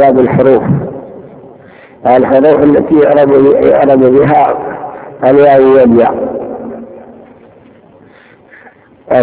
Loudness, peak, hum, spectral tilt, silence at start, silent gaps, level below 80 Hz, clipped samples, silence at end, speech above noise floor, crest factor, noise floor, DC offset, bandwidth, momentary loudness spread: -7 LUFS; 0 dBFS; none; -11.5 dB/octave; 0 s; none; -42 dBFS; 3%; 0 s; 34 dB; 8 dB; -40 dBFS; under 0.1%; 4 kHz; 17 LU